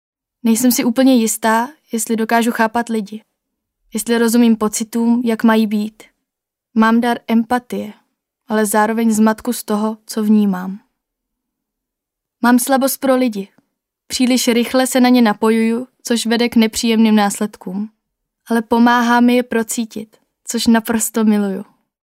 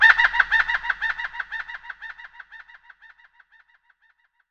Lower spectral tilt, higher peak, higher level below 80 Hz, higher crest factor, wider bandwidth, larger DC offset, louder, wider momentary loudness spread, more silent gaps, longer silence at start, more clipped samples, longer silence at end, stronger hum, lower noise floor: first, -4 dB/octave vs 0 dB/octave; about the same, 0 dBFS vs 0 dBFS; about the same, -56 dBFS vs -54 dBFS; second, 16 dB vs 24 dB; first, 16 kHz vs 8.2 kHz; neither; first, -15 LUFS vs -21 LUFS; second, 13 LU vs 25 LU; neither; first, 0.45 s vs 0 s; neither; second, 0.45 s vs 1.95 s; neither; first, -82 dBFS vs -65 dBFS